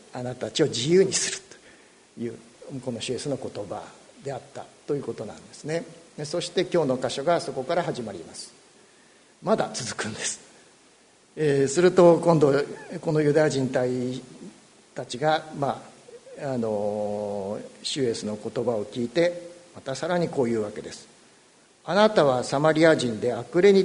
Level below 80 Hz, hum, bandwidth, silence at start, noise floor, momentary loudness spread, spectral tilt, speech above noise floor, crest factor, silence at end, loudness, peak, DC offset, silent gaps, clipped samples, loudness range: -64 dBFS; none; 11 kHz; 0.15 s; -57 dBFS; 20 LU; -5 dB/octave; 33 dB; 22 dB; 0 s; -25 LUFS; -4 dBFS; under 0.1%; none; under 0.1%; 11 LU